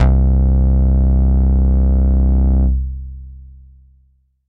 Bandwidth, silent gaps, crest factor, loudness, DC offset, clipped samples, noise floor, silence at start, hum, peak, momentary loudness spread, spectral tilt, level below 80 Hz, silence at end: 2.1 kHz; none; 12 dB; -15 LUFS; under 0.1%; under 0.1%; -56 dBFS; 0 s; none; -2 dBFS; 12 LU; -11.5 dB/octave; -14 dBFS; 1.05 s